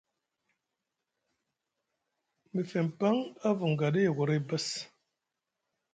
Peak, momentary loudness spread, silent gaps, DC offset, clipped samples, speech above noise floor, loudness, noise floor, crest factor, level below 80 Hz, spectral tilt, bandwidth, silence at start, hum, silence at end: -16 dBFS; 9 LU; none; under 0.1%; under 0.1%; 57 dB; -31 LUFS; -87 dBFS; 18 dB; -76 dBFS; -6 dB/octave; 9.4 kHz; 2.55 s; none; 1.05 s